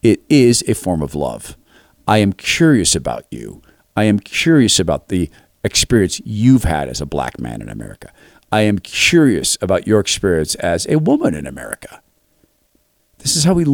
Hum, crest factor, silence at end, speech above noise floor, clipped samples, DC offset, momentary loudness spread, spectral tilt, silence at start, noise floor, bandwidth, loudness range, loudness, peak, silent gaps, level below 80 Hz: none; 16 dB; 0 s; 45 dB; under 0.1%; under 0.1%; 16 LU; -4.5 dB/octave; 0.05 s; -60 dBFS; 18.5 kHz; 3 LU; -15 LUFS; -2 dBFS; none; -36 dBFS